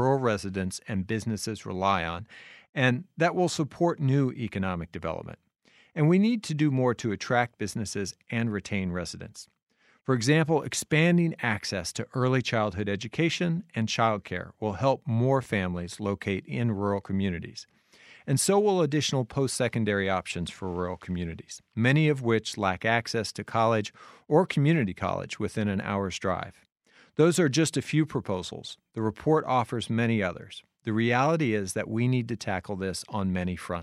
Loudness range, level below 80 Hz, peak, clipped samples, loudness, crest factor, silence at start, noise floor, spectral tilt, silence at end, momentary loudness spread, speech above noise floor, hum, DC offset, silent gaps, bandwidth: 3 LU; -62 dBFS; -8 dBFS; under 0.1%; -27 LUFS; 20 dB; 0 s; -55 dBFS; -5.5 dB/octave; 0 s; 11 LU; 28 dB; none; under 0.1%; 2.69-2.73 s, 9.63-9.67 s; 14.5 kHz